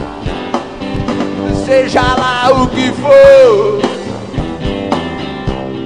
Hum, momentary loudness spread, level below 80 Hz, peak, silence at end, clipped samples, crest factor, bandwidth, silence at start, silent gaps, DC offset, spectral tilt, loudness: none; 15 LU; -30 dBFS; 0 dBFS; 0 s; 0.8%; 12 dB; 10 kHz; 0 s; none; 0.7%; -5.5 dB/octave; -11 LUFS